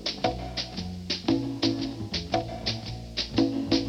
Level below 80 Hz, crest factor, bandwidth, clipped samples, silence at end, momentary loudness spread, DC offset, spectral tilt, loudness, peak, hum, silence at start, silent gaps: -46 dBFS; 20 dB; 11.5 kHz; under 0.1%; 0 s; 7 LU; under 0.1%; -5 dB/octave; -29 LUFS; -8 dBFS; none; 0 s; none